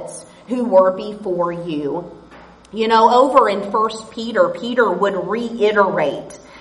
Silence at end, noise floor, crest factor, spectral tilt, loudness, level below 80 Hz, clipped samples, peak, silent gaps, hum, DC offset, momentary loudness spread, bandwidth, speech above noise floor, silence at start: 0 s; -42 dBFS; 18 dB; -5 dB/octave; -17 LUFS; -56 dBFS; under 0.1%; 0 dBFS; none; none; under 0.1%; 16 LU; 11.5 kHz; 26 dB; 0 s